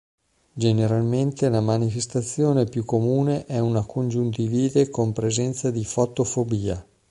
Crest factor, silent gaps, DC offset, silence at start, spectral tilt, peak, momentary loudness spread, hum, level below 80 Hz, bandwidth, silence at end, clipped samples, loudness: 16 dB; none; under 0.1%; 0.55 s; -6.5 dB/octave; -6 dBFS; 5 LU; none; -50 dBFS; 11.5 kHz; 0.3 s; under 0.1%; -23 LUFS